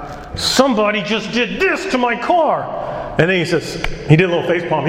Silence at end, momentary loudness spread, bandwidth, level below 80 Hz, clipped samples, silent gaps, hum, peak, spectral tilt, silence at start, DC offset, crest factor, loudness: 0 s; 10 LU; 16 kHz; -38 dBFS; under 0.1%; none; none; 0 dBFS; -5 dB/octave; 0 s; under 0.1%; 16 dB; -16 LUFS